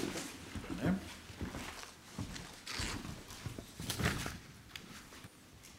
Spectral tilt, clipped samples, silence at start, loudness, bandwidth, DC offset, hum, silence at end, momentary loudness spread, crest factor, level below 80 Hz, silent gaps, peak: -4 dB/octave; under 0.1%; 0 s; -42 LUFS; 16 kHz; under 0.1%; none; 0 s; 14 LU; 24 dB; -54 dBFS; none; -18 dBFS